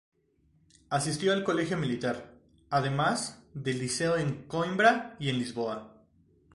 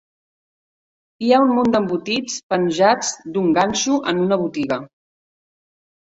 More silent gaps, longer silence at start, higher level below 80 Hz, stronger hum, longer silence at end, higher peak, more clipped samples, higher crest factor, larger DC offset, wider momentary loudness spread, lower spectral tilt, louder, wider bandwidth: second, none vs 2.43-2.49 s; second, 0.9 s vs 1.2 s; about the same, -62 dBFS vs -58 dBFS; neither; second, 0.65 s vs 1.15 s; second, -8 dBFS vs -2 dBFS; neither; about the same, 22 dB vs 18 dB; neither; about the same, 10 LU vs 8 LU; about the same, -4.5 dB/octave vs -4 dB/octave; second, -30 LUFS vs -19 LUFS; first, 11.5 kHz vs 8.2 kHz